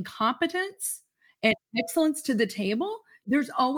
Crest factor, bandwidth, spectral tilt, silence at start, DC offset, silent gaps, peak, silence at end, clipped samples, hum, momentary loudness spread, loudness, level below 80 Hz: 20 dB; over 20 kHz; -3.5 dB/octave; 0 s; under 0.1%; none; -8 dBFS; 0 s; under 0.1%; none; 7 LU; -27 LUFS; -70 dBFS